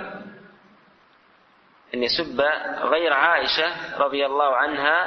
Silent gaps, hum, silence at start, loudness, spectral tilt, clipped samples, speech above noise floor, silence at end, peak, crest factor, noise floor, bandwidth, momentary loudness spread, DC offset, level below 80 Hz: none; none; 0 s; -21 LUFS; -4 dB/octave; under 0.1%; 35 dB; 0 s; -4 dBFS; 18 dB; -57 dBFS; 6.4 kHz; 8 LU; under 0.1%; -60 dBFS